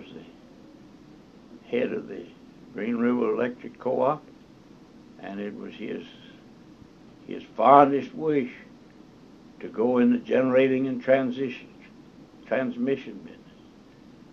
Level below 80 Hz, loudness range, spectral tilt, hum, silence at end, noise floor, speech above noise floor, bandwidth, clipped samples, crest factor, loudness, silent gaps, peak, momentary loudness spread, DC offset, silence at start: -66 dBFS; 9 LU; -8 dB/octave; none; 1 s; -51 dBFS; 27 dB; 6.6 kHz; under 0.1%; 24 dB; -25 LUFS; none; -2 dBFS; 21 LU; under 0.1%; 0 s